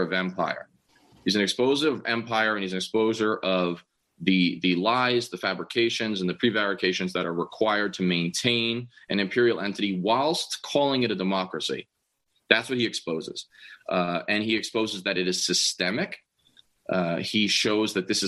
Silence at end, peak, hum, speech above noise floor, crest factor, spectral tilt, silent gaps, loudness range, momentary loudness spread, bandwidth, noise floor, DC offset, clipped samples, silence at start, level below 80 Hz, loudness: 0 s; 0 dBFS; none; 48 dB; 26 dB; -4 dB/octave; none; 2 LU; 8 LU; 12.5 kHz; -74 dBFS; under 0.1%; under 0.1%; 0 s; -68 dBFS; -25 LUFS